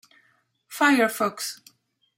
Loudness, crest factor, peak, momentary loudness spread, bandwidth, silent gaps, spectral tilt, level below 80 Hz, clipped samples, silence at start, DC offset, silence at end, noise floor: -23 LUFS; 20 dB; -6 dBFS; 20 LU; 16 kHz; none; -3 dB/octave; -78 dBFS; under 0.1%; 0.7 s; under 0.1%; 0.6 s; -66 dBFS